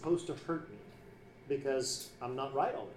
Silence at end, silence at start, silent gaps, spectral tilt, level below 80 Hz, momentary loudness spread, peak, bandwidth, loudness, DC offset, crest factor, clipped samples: 0 s; 0 s; none; -4 dB/octave; -66 dBFS; 21 LU; -20 dBFS; 15.5 kHz; -37 LUFS; under 0.1%; 18 dB; under 0.1%